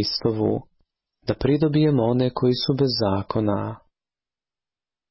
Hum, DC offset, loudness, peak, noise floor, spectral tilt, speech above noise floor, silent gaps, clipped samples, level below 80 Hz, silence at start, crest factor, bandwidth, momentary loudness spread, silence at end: none; under 0.1%; -22 LUFS; -10 dBFS; under -90 dBFS; -10 dB/octave; over 69 dB; none; under 0.1%; -48 dBFS; 0 s; 14 dB; 5.8 kHz; 11 LU; 1.35 s